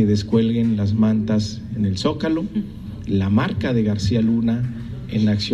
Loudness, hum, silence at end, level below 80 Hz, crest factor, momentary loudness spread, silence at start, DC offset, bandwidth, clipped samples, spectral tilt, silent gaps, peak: -20 LUFS; none; 0 s; -42 dBFS; 16 dB; 9 LU; 0 s; under 0.1%; 9.4 kHz; under 0.1%; -7 dB/octave; none; -4 dBFS